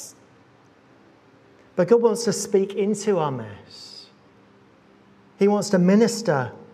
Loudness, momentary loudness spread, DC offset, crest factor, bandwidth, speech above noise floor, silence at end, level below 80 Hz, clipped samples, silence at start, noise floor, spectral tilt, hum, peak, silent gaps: -21 LUFS; 22 LU; under 0.1%; 18 dB; 14.5 kHz; 34 dB; 0.1 s; -74 dBFS; under 0.1%; 0 s; -54 dBFS; -5.5 dB/octave; none; -4 dBFS; none